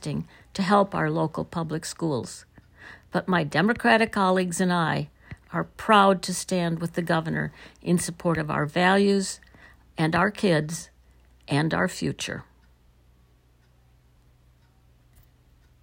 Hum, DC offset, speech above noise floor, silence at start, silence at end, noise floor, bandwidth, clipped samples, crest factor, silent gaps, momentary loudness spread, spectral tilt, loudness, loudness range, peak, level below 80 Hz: none; under 0.1%; 35 dB; 0 s; 3.4 s; -60 dBFS; 16 kHz; under 0.1%; 22 dB; none; 14 LU; -5 dB/octave; -24 LUFS; 8 LU; -4 dBFS; -56 dBFS